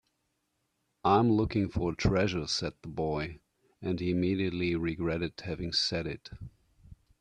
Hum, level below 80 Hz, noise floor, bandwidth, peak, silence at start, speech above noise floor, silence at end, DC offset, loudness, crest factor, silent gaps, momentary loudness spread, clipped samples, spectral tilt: none; -50 dBFS; -79 dBFS; 10 kHz; -12 dBFS; 1.05 s; 49 dB; 0.25 s; under 0.1%; -31 LUFS; 20 dB; none; 13 LU; under 0.1%; -5.5 dB/octave